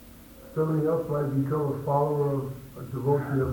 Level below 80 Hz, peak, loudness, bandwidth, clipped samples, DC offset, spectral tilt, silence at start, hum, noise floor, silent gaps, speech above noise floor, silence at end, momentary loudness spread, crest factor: -54 dBFS; -12 dBFS; -27 LUFS; 19.5 kHz; under 0.1%; under 0.1%; -9.5 dB/octave; 0 s; none; -48 dBFS; none; 21 dB; 0 s; 12 LU; 16 dB